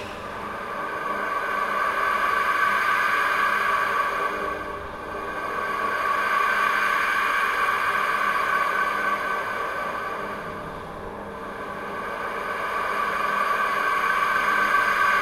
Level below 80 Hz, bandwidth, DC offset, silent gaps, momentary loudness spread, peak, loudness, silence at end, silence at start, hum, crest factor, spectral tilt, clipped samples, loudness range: -54 dBFS; 16 kHz; under 0.1%; none; 12 LU; -8 dBFS; -23 LUFS; 0 s; 0 s; none; 16 dB; -3 dB/octave; under 0.1%; 7 LU